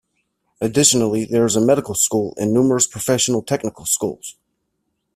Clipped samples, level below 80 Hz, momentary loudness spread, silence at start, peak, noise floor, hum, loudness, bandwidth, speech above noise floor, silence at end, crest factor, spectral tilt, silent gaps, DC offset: under 0.1%; -54 dBFS; 10 LU; 0.6 s; 0 dBFS; -73 dBFS; none; -17 LUFS; 16 kHz; 55 dB; 0.85 s; 20 dB; -4 dB/octave; none; under 0.1%